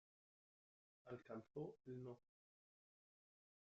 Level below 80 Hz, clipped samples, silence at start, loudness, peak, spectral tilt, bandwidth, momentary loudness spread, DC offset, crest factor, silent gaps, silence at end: under -90 dBFS; under 0.1%; 1.05 s; -56 LUFS; -40 dBFS; -8.5 dB/octave; 7 kHz; 5 LU; under 0.1%; 20 dB; none; 1.6 s